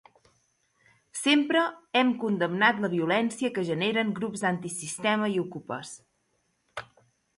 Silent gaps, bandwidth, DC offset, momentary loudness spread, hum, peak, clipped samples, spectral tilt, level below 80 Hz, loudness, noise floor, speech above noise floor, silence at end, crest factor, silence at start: none; 11.5 kHz; under 0.1%; 18 LU; none; -8 dBFS; under 0.1%; -4 dB/octave; -72 dBFS; -27 LUFS; -73 dBFS; 47 dB; 0.55 s; 20 dB; 1.15 s